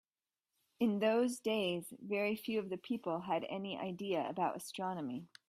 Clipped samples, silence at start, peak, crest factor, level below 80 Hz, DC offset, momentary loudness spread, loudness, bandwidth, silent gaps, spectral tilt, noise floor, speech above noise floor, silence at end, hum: under 0.1%; 0.8 s; -20 dBFS; 18 dB; -80 dBFS; under 0.1%; 9 LU; -38 LUFS; 15.5 kHz; none; -5 dB/octave; under -90 dBFS; over 53 dB; 0.2 s; none